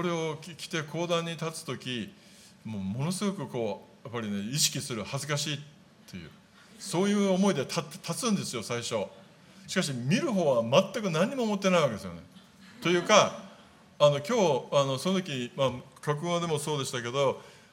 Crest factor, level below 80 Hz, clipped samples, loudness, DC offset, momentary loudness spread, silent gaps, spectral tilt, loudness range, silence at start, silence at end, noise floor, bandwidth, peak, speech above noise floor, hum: 24 dB; -74 dBFS; under 0.1%; -29 LUFS; under 0.1%; 14 LU; none; -4.5 dB/octave; 7 LU; 0 s; 0.2 s; -55 dBFS; 16.5 kHz; -4 dBFS; 26 dB; none